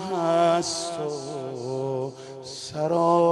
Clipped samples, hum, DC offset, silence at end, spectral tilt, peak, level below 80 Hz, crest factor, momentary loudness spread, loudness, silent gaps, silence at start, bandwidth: under 0.1%; none; under 0.1%; 0 s; -5 dB/octave; -8 dBFS; -66 dBFS; 16 dB; 14 LU; -26 LUFS; none; 0 s; 11.5 kHz